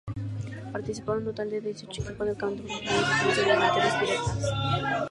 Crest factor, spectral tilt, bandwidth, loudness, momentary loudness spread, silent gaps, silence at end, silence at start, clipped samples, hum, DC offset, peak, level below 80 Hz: 18 dB; -4.5 dB/octave; 11.5 kHz; -28 LUFS; 13 LU; none; 0 s; 0.05 s; under 0.1%; none; under 0.1%; -10 dBFS; -50 dBFS